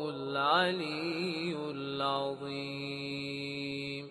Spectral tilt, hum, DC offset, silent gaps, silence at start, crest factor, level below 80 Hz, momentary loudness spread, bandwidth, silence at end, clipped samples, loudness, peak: -5.5 dB/octave; none; under 0.1%; none; 0 s; 20 dB; -72 dBFS; 10 LU; 12.5 kHz; 0 s; under 0.1%; -34 LUFS; -14 dBFS